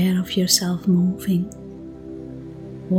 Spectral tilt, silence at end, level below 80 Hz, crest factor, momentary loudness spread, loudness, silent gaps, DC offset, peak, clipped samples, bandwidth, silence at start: -4.5 dB/octave; 0 s; -50 dBFS; 20 dB; 19 LU; -20 LUFS; none; under 0.1%; -2 dBFS; under 0.1%; 17.5 kHz; 0 s